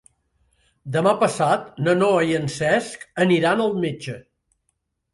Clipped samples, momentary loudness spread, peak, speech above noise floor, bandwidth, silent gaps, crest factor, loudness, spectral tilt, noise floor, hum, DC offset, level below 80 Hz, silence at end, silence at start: under 0.1%; 14 LU; -6 dBFS; 53 dB; 11.5 kHz; none; 16 dB; -20 LUFS; -5.5 dB/octave; -74 dBFS; none; under 0.1%; -60 dBFS; 0.95 s; 0.85 s